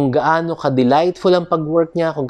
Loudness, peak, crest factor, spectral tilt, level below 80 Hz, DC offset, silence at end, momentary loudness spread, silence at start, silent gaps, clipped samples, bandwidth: -16 LUFS; -2 dBFS; 14 dB; -7.5 dB/octave; -54 dBFS; under 0.1%; 0 s; 4 LU; 0 s; none; under 0.1%; 9.8 kHz